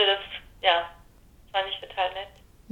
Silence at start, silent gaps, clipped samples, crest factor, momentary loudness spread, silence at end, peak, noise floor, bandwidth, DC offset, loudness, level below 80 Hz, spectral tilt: 0 s; none; under 0.1%; 22 dB; 16 LU; 0.45 s; -8 dBFS; -54 dBFS; 16.5 kHz; under 0.1%; -27 LUFS; -56 dBFS; -3 dB/octave